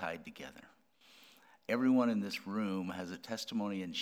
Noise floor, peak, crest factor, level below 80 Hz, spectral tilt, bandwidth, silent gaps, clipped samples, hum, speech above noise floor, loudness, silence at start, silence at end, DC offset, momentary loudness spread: -63 dBFS; -20 dBFS; 18 dB; -78 dBFS; -5.5 dB/octave; 15.5 kHz; none; under 0.1%; none; 27 dB; -36 LUFS; 0 s; 0 s; under 0.1%; 19 LU